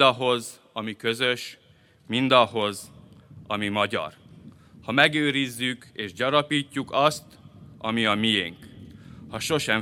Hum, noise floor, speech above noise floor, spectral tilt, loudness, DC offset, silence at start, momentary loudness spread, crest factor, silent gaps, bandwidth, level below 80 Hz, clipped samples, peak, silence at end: none; -48 dBFS; 24 dB; -4 dB/octave; -24 LUFS; under 0.1%; 0 s; 18 LU; 24 dB; none; 17 kHz; -62 dBFS; under 0.1%; -2 dBFS; 0 s